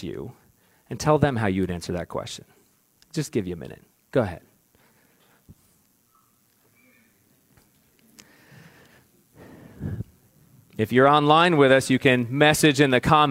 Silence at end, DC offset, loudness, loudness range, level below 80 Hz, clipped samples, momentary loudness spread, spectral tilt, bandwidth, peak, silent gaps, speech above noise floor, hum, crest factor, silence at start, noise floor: 0 s; under 0.1%; -21 LUFS; 23 LU; -54 dBFS; under 0.1%; 22 LU; -5 dB/octave; 16.5 kHz; -2 dBFS; none; 43 dB; none; 22 dB; 0 s; -63 dBFS